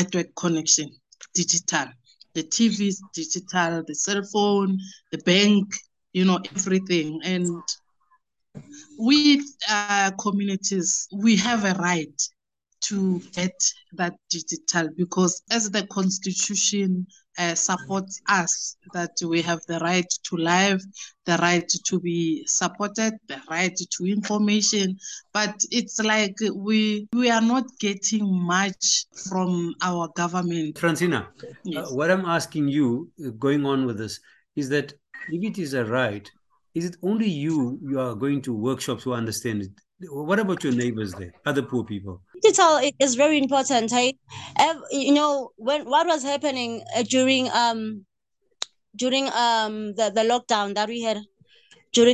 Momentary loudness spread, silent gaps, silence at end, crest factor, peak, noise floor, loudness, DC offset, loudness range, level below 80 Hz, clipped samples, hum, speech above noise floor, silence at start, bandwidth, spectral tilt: 11 LU; none; 0 s; 20 dB; -4 dBFS; -74 dBFS; -23 LUFS; under 0.1%; 5 LU; -64 dBFS; under 0.1%; none; 51 dB; 0 s; 12.5 kHz; -3.5 dB/octave